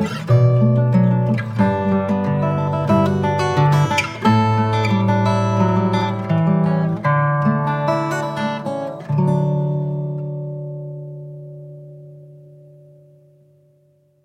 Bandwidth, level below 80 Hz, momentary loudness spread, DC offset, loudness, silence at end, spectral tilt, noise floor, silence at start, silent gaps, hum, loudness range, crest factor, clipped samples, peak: 10 kHz; -50 dBFS; 14 LU; under 0.1%; -18 LUFS; 1.85 s; -7.5 dB/octave; -57 dBFS; 0 s; none; none; 13 LU; 14 dB; under 0.1%; -4 dBFS